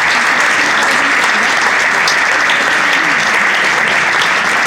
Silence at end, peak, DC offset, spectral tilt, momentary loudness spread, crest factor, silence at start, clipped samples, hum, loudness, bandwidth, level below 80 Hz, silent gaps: 0 s; 0 dBFS; under 0.1%; -1 dB/octave; 1 LU; 12 dB; 0 s; under 0.1%; none; -10 LUFS; 18 kHz; -54 dBFS; none